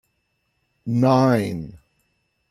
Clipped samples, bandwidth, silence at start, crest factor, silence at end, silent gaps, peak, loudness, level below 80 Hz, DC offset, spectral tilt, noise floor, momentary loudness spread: under 0.1%; 14 kHz; 0.85 s; 16 dB; 0.75 s; none; -6 dBFS; -19 LUFS; -58 dBFS; under 0.1%; -8 dB/octave; -71 dBFS; 19 LU